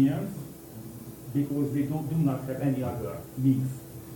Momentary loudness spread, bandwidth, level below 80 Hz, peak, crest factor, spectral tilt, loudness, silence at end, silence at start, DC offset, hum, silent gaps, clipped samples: 16 LU; 17.5 kHz; -56 dBFS; -12 dBFS; 16 dB; -8.5 dB/octave; -29 LUFS; 0 s; 0 s; under 0.1%; none; none; under 0.1%